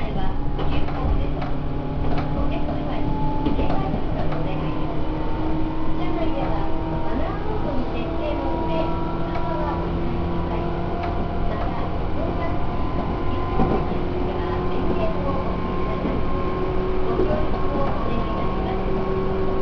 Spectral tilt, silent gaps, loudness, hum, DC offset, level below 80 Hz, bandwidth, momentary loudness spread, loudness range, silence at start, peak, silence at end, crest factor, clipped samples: -9 dB/octave; none; -25 LUFS; none; under 0.1%; -26 dBFS; 5.4 kHz; 3 LU; 2 LU; 0 s; -6 dBFS; 0 s; 14 dB; under 0.1%